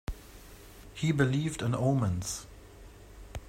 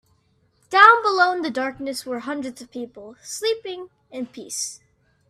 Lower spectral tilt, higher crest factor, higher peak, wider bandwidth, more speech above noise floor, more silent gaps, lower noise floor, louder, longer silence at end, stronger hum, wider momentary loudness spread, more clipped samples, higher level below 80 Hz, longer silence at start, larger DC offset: first, -6 dB/octave vs -1.5 dB/octave; about the same, 20 dB vs 22 dB; second, -12 dBFS vs 0 dBFS; about the same, 16 kHz vs 15 kHz; second, 22 dB vs 42 dB; neither; second, -51 dBFS vs -64 dBFS; second, -30 LUFS vs -20 LUFS; second, 0 s vs 0.55 s; neither; about the same, 24 LU vs 22 LU; neither; first, -48 dBFS vs -68 dBFS; second, 0.1 s vs 0.7 s; neither